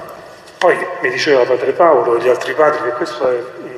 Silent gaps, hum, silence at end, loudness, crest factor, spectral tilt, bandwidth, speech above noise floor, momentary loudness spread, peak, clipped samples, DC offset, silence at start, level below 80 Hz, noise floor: none; none; 0 s; -14 LUFS; 14 dB; -4.5 dB/octave; 13 kHz; 22 dB; 7 LU; 0 dBFS; under 0.1%; under 0.1%; 0 s; -62 dBFS; -36 dBFS